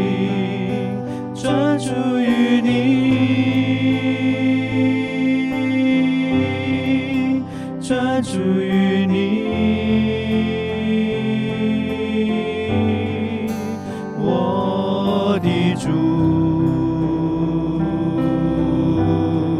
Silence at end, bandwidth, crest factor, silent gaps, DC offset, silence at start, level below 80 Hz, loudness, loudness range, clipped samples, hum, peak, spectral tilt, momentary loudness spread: 0 s; 11 kHz; 14 dB; none; under 0.1%; 0 s; -44 dBFS; -19 LUFS; 3 LU; under 0.1%; none; -4 dBFS; -7 dB/octave; 6 LU